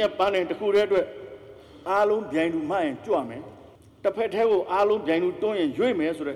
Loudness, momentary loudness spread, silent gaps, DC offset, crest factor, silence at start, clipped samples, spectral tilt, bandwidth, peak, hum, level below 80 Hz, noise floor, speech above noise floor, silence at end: -25 LUFS; 15 LU; none; under 0.1%; 14 dB; 0 s; under 0.1%; -6 dB/octave; 12 kHz; -10 dBFS; none; -60 dBFS; -46 dBFS; 22 dB; 0 s